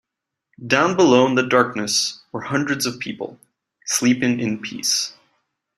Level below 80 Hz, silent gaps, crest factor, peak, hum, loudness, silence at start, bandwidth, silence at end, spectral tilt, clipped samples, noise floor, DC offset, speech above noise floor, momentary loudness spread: -62 dBFS; none; 20 dB; -2 dBFS; none; -19 LUFS; 0.6 s; 15.5 kHz; 0.65 s; -3.5 dB/octave; under 0.1%; -83 dBFS; under 0.1%; 64 dB; 16 LU